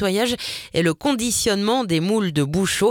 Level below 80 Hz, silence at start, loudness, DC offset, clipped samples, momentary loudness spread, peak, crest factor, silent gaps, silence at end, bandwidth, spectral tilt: -48 dBFS; 0 s; -20 LUFS; under 0.1%; under 0.1%; 3 LU; -6 dBFS; 14 dB; none; 0 s; 18.5 kHz; -4 dB/octave